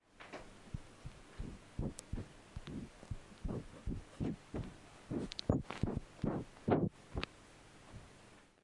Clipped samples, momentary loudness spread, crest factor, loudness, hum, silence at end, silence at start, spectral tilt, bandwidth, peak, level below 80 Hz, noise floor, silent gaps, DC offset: under 0.1%; 19 LU; 26 dB; -43 LUFS; none; 0.2 s; 0.15 s; -6.5 dB/octave; 11.5 kHz; -18 dBFS; -52 dBFS; -62 dBFS; none; under 0.1%